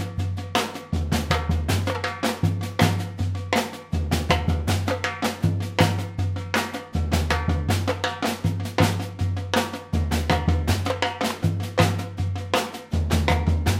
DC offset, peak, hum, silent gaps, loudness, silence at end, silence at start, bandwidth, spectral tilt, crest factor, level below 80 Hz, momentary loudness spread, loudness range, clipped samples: under 0.1%; -2 dBFS; none; none; -24 LUFS; 0 s; 0 s; 16 kHz; -5.5 dB/octave; 20 dB; -34 dBFS; 6 LU; 1 LU; under 0.1%